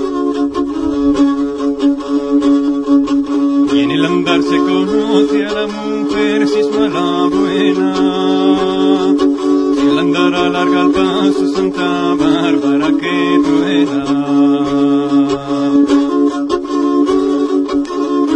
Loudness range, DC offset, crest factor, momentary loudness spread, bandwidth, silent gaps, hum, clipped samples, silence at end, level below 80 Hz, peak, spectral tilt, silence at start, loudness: 1 LU; under 0.1%; 12 dB; 4 LU; 9.6 kHz; none; none; under 0.1%; 0 s; -44 dBFS; 0 dBFS; -6 dB/octave; 0 s; -13 LUFS